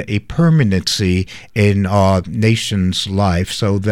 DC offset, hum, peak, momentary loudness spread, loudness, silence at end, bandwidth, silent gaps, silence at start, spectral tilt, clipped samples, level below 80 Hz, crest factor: under 0.1%; none; -2 dBFS; 4 LU; -15 LUFS; 0 s; 15 kHz; none; 0 s; -6 dB/octave; under 0.1%; -38 dBFS; 14 dB